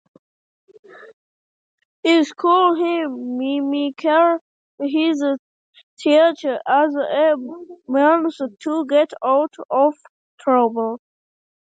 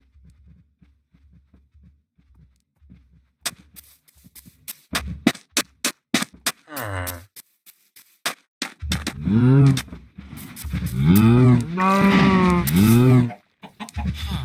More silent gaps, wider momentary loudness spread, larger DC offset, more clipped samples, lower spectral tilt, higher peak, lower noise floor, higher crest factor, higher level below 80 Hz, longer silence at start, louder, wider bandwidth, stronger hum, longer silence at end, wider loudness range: first, 1.13-1.78 s, 1.85-2.03 s, 4.41-4.78 s, 5.39-5.73 s, 5.83-5.97 s, 9.65-9.69 s, 10.09-10.38 s vs 8.48-8.61 s; second, 10 LU vs 23 LU; neither; neither; second, -4 dB/octave vs -6 dB/octave; about the same, -2 dBFS vs 0 dBFS; first, under -90 dBFS vs -59 dBFS; about the same, 16 dB vs 20 dB; second, -78 dBFS vs -40 dBFS; second, 1 s vs 3.45 s; about the same, -19 LUFS vs -20 LUFS; second, 9 kHz vs 16.5 kHz; neither; first, 0.75 s vs 0 s; second, 2 LU vs 22 LU